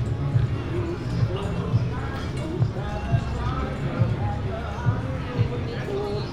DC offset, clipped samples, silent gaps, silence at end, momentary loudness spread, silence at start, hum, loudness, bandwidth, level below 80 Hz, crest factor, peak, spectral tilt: under 0.1%; under 0.1%; none; 0 s; 5 LU; 0 s; none; -27 LUFS; 10 kHz; -34 dBFS; 16 dB; -10 dBFS; -8 dB/octave